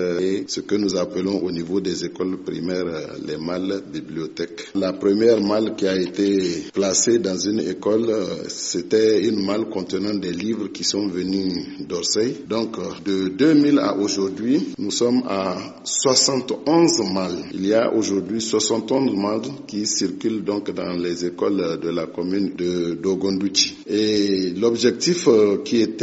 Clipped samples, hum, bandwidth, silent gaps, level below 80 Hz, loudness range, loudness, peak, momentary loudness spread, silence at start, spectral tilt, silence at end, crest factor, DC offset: under 0.1%; none; 8 kHz; none; -60 dBFS; 5 LU; -21 LUFS; -2 dBFS; 10 LU; 0 s; -4.5 dB/octave; 0 s; 18 dB; under 0.1%